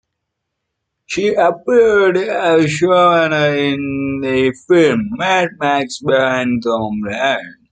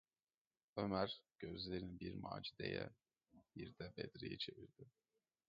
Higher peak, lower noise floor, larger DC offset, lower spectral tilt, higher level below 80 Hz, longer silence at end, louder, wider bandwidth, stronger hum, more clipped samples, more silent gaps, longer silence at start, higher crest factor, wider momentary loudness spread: first, -2 dBFS vs -26 dBFS; second, -76 dBFS vs under -90 dBFS; neither; first, -5.5 dB/octave vs -4 dB/octave; first, -52 dBFS vs -70 dBFS; second, 0.2 s vs 0.6 s; first, -15 LUFS vs -48 LUFS; first, 9.4 kHz vs 7.2 kHz; neither; neither; neither; first, 1.1 s vs 0.75 s; second, 14 dB vs 24 dB; second, 7 LU vs 17 LU